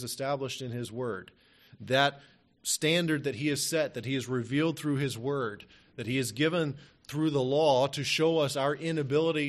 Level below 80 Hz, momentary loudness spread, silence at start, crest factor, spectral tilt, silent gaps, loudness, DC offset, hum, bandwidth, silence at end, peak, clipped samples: -68 dBFS; 11 LU; 0 s; 20 dB; -4.5 dB/octave; none; -29 LUFS; under 0.1%; none; 13 kHz; 0 s; -10 dBFS; under 0.1%